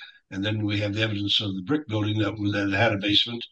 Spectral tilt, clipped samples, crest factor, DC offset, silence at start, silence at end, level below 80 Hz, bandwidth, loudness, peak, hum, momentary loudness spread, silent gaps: -6 dB/octave; under 0.1%; 20 dB; under 0.1%; 0 s; 0.05 s; -60 dBFS; 8.2 kHz; -24 LUFS; -6 dBFS; none; 7 LU; none